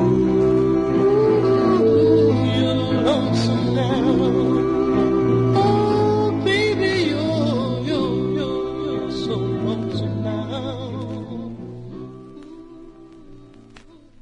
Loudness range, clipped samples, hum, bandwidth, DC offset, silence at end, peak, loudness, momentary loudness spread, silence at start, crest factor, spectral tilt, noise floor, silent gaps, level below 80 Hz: 13 LU; under 0.1%; none; 10.5 kHz; under 0.1%; 0.45 s; -6 dBFS; -19 LUFS; 14 LU; 0 s; 14 dB; -7.5 dB/octave; -46 dBFS; none; -44 dBFS